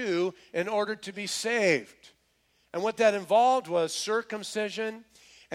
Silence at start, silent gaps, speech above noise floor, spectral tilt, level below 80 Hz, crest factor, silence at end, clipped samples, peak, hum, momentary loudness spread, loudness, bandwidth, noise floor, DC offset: 0 s; none; 42 dB; -3.5 dB/octave; -76 dBFS; 18 dB; 0 s; under 0.1%; -10 dBFS; none; 11 LU; -28 LUFS; 15.5 kHz; -70 dBFS; under 0.1%